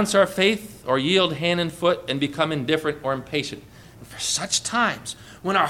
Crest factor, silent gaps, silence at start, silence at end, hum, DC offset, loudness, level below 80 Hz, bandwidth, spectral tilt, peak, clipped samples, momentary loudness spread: 18 dB; none; 0 s; 0 s; none; under 0.1%; -23 LUFS; -56 dBFS; 17.5 kHz; -3.5 dB/octave; -6 dBFS; under 0.1%; 12 LU